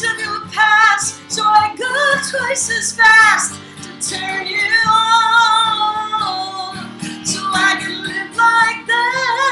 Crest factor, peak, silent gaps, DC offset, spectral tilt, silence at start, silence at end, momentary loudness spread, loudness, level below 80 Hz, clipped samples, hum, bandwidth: 16 dB; 0 dBFS; none; under 0.1%; -1 dB/octave; 0 s; 0 s; 12 LU; -14 LUFS; -58 dBFS; under 0.1%; none; 15.5 kHz